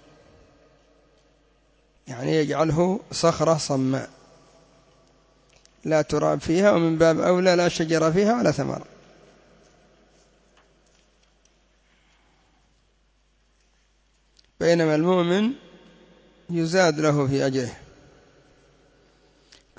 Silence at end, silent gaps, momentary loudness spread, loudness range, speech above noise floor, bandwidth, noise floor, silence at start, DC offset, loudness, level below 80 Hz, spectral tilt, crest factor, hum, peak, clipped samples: 2 s; none; 11 LU; 7 LU; 43 dB; 8 kHz; -64 dBFS; 2.05 s; under 0.1%; -22 LUFS; -56 dBFS; -5.5 dB/octave; 18 dB; none; -6 dBFS; under 0.1%